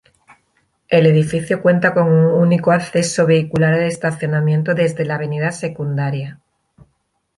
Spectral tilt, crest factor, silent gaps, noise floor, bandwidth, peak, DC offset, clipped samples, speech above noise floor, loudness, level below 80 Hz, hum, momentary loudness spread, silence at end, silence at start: -6.5 dB/octave; 14 dB; none; -67 dBFS; 11.5 kHz; -2 dBFS; under 0.1%; under 0.1%; 51 dB; -16 LUFS; -54 dBFS; none; 8 LU; 1.05 s; 0.9 s